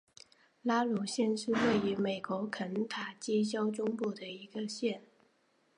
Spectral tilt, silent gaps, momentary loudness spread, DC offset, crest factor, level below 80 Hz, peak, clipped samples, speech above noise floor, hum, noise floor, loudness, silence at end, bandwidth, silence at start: -5 dB/octave; none; 9 LU; under 0.1%; 18 dB; -74 dBFS; -18 dBFS; under 0.1%; 39 dB; none; -72 dBFS; -34 LUFS; 0.75 s; 11 kHz; 0.65 s